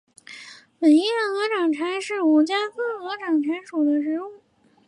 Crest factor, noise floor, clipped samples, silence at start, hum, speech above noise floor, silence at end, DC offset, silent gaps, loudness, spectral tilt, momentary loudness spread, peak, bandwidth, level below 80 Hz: 14 dB; -44 dBFS; under 0.1%; 0.3 s; none; 23 dB; 0.5 s; under 0.1%; none; -22 LUFS; -3 dB/octave; 21 LU; -8 dBFS; 11 kHz; -80 dBFS